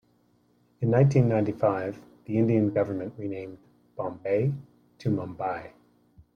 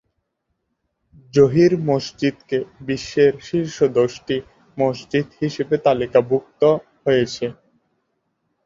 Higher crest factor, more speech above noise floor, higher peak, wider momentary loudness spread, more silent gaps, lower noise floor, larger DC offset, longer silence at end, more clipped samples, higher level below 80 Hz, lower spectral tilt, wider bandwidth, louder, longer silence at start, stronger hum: about the same, 18 dB vs 18 dB; second, 40 dB vs 56 dB; second, -10 dBFS vs -2 dBFS; first, 16 LU vs 10 LU; neither; second, -65 dBFS vs -74 dBFS; neither; second, 0.65 s vs 1.15 s; neither; second, -62 dBFS vs -56 dBFS; first, -9.5 dB/octave vs -6.5 dB/octave; second, 6.8 kHz vs 7.6 kHz; second, -27 LUFS vs -20 LUFS; second, 0.8 s vs 1.35 s; neither